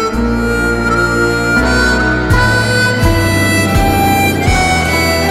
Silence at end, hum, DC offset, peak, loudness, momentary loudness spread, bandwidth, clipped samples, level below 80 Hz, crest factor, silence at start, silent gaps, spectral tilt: 0 s; none; under 0.1%; 0 dBFS; -11 LUFS; 3 LU; 16.5 kHz; under 0.1%; -22 dBFS; 10 dB; 0 s; none; -5 dB/octave